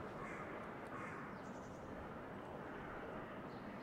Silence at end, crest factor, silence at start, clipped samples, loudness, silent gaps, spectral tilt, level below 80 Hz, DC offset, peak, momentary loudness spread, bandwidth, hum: 0 s; 12 dB; 0 s; under 0.1%; -50 LUFS; none; -6.5 dB/octave; -66 dBFS; under 0.1%; -36 dBFS; 3 LU; 16 kHz; none